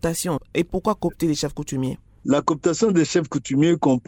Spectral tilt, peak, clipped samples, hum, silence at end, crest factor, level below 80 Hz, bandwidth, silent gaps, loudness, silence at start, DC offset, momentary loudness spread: -5.5 dB/octave; -6 dBFS; under 0.1%; none; 0.1 s; 16 dB; -46 dBFS; 17.5 kHz; none; -22 LUFS; 0.05 s; under 0.1%; 8 LU